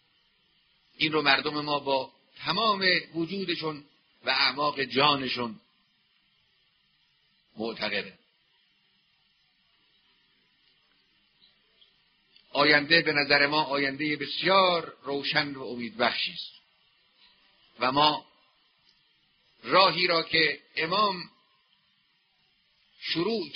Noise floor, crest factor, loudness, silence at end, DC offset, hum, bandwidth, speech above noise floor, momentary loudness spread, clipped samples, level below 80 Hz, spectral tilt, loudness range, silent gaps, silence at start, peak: -69 dBFS; 24 dB; -25 LUFS; 0 s; under 0.1%; none; 6.2 kHz; 43 dB; 15 LU; under 0.1%; -70 dBFS; -1 dB/octave; 14 LU; none; 1 s; -6 dBFS